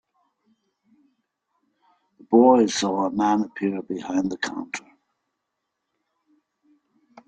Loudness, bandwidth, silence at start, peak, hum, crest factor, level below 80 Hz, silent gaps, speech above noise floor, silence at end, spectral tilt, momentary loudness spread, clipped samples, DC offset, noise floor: -22 LUFS; 9.2 kHz; 2.3 s; -4 dBFS; none; 22 dB; -68 dBFS; none; 59 dB; 2.5 s; -5 dB/octave; 15 LU; under 0.1%; under 0.1%; -80 dBFS